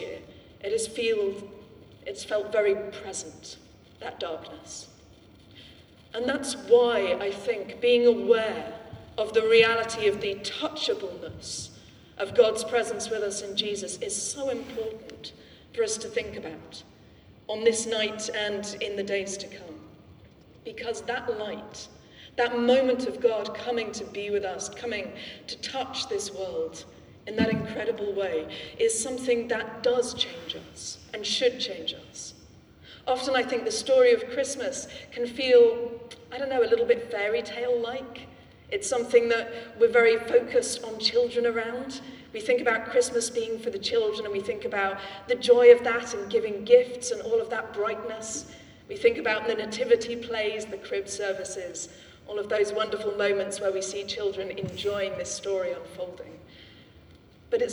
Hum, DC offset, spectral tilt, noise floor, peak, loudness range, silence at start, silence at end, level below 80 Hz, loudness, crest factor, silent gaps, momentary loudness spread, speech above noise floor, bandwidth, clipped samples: none; under 0.1%; -2.5 dB/octave; -53 dBFS; -4 dBFS; 9 LU; 0 s; 0 s; -62 dBFS; -27 LUFS; 24 dB; none; 18 LU; 27 dB; 12 kHz; under 0.1%